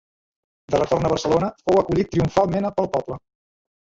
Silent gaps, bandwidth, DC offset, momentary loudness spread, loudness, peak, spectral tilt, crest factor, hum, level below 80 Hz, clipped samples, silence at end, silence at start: none; 8 kHz; under 0.1%; 6 LU; -21 LUFS; -4 dBFS; -6.5 dB/octave; 18 dB; none; -46 dBFS; under 0.1%; 0.8 s; 0.7 s